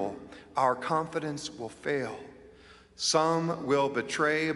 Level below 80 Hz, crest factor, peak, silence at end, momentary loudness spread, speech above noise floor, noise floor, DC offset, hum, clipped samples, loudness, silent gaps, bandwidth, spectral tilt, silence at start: -66 dBFS; 20 dB; -10 dBFS; 0 s; 13 LU; 25 dB; -55 dBFS; under 0.1%; none; under 0.1%; -29 LUFS; none; 11.5 kHz; -4 dB/octave; 0 s